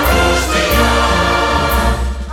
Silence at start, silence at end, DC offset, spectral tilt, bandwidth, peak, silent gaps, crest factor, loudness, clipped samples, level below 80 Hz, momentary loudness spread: 0 s; 0 s; under 0.1%; -4 dB/octave; 18.5 kHz; 0 dBFS; none; 12 dB; -13 LUFS; under 0.1%; -18 dBFS; 3 LU